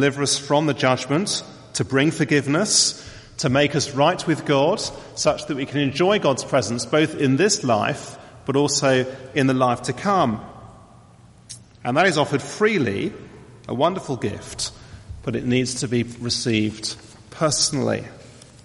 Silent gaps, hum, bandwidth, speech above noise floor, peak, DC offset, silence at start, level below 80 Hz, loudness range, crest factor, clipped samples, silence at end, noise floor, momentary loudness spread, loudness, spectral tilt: none; none; 11.5 kHz; 28 dB; -4 dBFS; under 0.1%; 0 s; -52 dBFS; 5 LU; 18 dB; under 0.1%; 0.25 s; -49 dBFS; 13 LU; -21 LUFS; -4 dB/octave